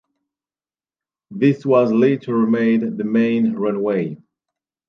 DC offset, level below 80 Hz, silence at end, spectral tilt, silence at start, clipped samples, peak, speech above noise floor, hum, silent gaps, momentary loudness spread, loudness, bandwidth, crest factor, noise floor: under 0.1%; -68 dBFS; 0.7 s; -9 dB/octave; 1.3 s; under 0.1%; -2 dBFS; over 73 dB; none; none; 6 LU; -18 LUFS; 6.2 kHz; 16 dB; under -90 dBFS